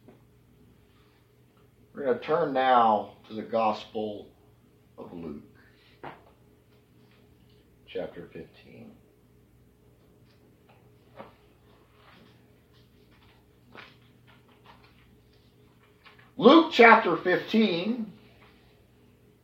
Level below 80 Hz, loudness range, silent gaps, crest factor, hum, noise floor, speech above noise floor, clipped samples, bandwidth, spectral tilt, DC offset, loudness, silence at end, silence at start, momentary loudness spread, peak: -68 dBFS; 23 LU; none; 26 dB; none; -61 dBFS; 37 dB; under 0.1%; 7.8 kHz; -6 dB/octave; under 0.1%; -23 LUFS; 1.3 s; 1.95 s; 29 LU; -4 dBFS